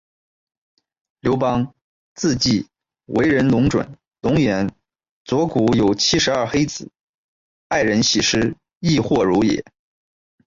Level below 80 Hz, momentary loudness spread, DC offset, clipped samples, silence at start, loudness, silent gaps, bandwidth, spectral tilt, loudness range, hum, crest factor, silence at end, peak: -46 dBFS; 9 LU; under 0.1%; under 0.1%; 1.25 s; -19 LUFS; 1.84-2.16 s, 5.09-5.25 s, 7.01-7.70 s, 8.77-8.81 s; 7.8 kHz; -4.5 dB/octave; 2 LU; none; 14 dB; 0.85 s; -6 dBFS